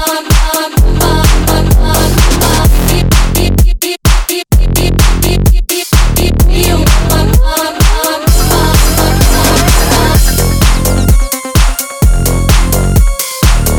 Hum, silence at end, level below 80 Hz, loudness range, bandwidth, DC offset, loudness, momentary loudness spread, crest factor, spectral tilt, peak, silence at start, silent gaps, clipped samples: none; 0 s; -10 dBFS; 1 LU; over 20 kHz; under 0.1%; -10 LUFS; 3 LU; 8 dB; -4.5 dB/octave; 0 dBFS; 0 s; none; under 0.1%